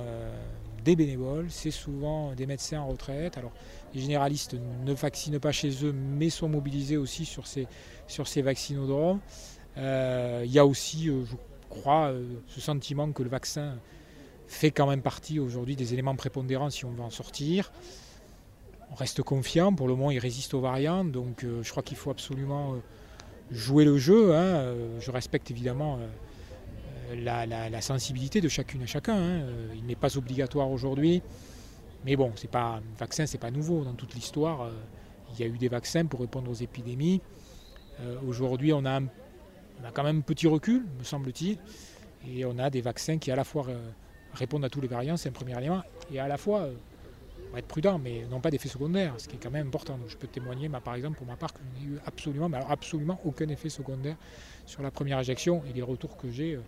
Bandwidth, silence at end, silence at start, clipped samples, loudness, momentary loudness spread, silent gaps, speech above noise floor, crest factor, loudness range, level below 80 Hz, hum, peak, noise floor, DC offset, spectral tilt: 15.5 kHz; 0 s; 0 s; under 0.1%; -30 LUFS; 17 LU; none; 22 dB; 24 dB; 7 LU; -50 dBFS; none; -6 dBFS; -52 dBFS; under 0.1%; -6 dB/octave